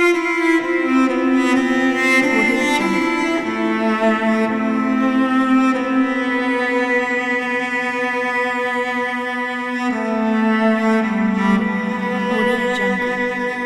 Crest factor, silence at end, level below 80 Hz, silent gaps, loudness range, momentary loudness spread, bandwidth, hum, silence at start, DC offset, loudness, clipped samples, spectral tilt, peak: 14 dB; 0 s; -54 dBFS; none; 3 LU; 5 LU; 13 kHz; none; 0 s; under 0.1%; -17 LUFS; under 0.1%; -5 dB/octave; -4 dBFS